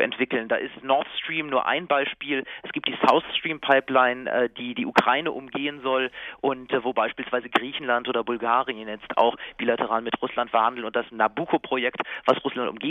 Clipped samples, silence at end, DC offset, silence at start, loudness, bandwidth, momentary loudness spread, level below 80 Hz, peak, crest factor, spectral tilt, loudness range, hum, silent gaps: under 0.1%; 0 s; under 0.1%; 0 s; -25 LUFS; 12.5 kHz; 8 LU; -66 dBFS; -2 dBFS; 22 dB; -5.5 dB/octave; 3 LU; none; none